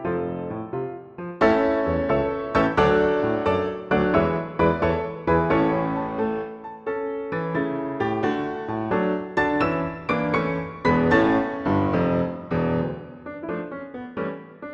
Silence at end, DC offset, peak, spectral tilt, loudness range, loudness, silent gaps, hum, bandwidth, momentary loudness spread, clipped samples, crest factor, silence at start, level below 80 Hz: 0 s; under 0.1%; -4 dBFS; -8 dB/octave; 5 LU; -23 LUFS; none; none; 7.8 kHz; 12 LU; under 0.1%; 18 dB; 0 s; -44 dBFS